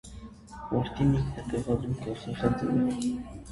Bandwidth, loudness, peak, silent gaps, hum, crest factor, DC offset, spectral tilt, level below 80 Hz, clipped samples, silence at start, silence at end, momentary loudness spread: 11.5 kHz; -30 LUFS; -12 dBFS; none; none; 18 dB; under 0.1%; -7.5 dB/octave; -46 dBFS; under 0.1%; 0.05 s; 0 s; 17 LU